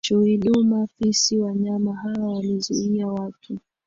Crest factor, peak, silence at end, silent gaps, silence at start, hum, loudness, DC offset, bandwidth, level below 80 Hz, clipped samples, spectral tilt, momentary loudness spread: 14 dB; -8 dBFS; 0.3 s; none; 0.05 s; none; -22 LUFS; under 0.1%; 7.8 kHz; -58 dBFS; under 0.1%; -5 dB/octave; 11 LU